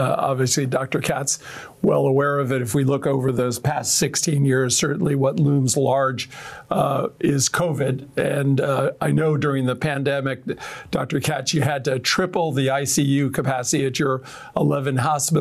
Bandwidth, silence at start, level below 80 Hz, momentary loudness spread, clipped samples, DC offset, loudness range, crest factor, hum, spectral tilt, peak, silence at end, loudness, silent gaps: 15.5 kHz; 0 s; -56 dBFS; 6 LU; under 0.1%; under 0.1%; 3 LU; 12 dB; none; -4.5 dB/octave; -8 dBFS; 0 s; -21 LUFS; none